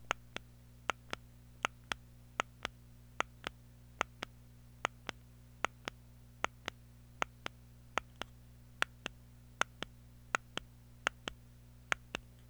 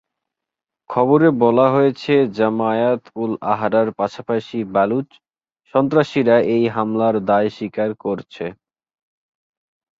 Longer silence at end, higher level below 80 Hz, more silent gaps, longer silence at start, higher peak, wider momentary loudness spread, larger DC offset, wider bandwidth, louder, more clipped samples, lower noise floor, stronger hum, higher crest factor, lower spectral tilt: second, 0.3 s vs 1.45 s; about the same, -62 dBFS vs -60 dBFS; neither; second, 0 s vs 0.9 s; second, -12 dBFS vs -2 dBFS; first, 20 LU vs 11 LU; neither; first, over 20 kHz vs 7.6 kHz; second, -42 LUFS vs -18 LUFS; neither; second, -58 dBFS vs -85 dBFS; first, 60 Hz at -60 dBFS vs none; first, 34 dB vs 16 dB; second, -2.5 dB/octave vs -8 dB/octave